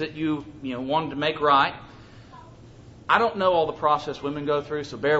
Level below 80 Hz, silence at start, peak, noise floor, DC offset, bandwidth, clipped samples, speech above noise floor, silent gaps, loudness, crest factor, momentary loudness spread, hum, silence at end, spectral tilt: -56 dBFS; 0 s; -4 dBFS; -47 dBFS; under 0.1%; 8 kHz; under 0.1%; 23 dB; none; -24 LUFS; 20 dB; 12 LU; none; 0 s; -6 dB/octave